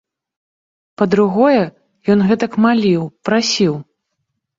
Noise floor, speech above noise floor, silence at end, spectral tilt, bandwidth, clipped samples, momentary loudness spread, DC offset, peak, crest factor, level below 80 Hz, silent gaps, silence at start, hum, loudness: -73 dBFS; 59 dB; 0.75 s; -5.5 dB/octave; 7.6 kHz; under 0.1%; 7 LU; under 0.1%; -2 dBFS; 14 dB; -56 dBFS; none; 1 s; none; -15 LUFS